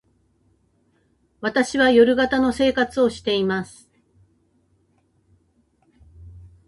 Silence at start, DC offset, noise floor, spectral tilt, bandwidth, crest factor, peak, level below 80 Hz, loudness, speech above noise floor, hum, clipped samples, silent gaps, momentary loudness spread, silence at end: 1.4 s; under 0.1%; -64 dBFS; -4.5 dB/octave; 11.5 kHz; 20 dB; -4 dBFS; -52 dBFS; -19 LUFS; 45 dB; none; under 0.1%; none; 11 LU; 0.3 s